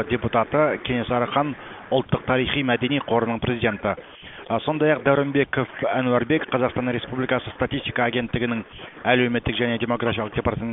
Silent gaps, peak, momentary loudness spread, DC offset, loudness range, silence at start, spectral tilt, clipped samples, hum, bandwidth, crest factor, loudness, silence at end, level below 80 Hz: none; -4 dBFS; 7 LU; under 0.1%; 1 LU; 0 s; -11 dB/octave; under 0.1%; none; 4 kHz; 20 dB; -23 LUFS; 0 s; -46 dBFS